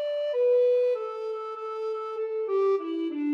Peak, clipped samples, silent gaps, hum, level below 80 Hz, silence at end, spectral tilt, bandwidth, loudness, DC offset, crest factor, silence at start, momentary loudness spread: -16 dBFS; under 0.1%; none; none; under -90 dBFS; 0 s; -4.5 dB/octave; 6 kHz; -27 LUFS; under 0.1%; 10 dB; 0 s; 11 LU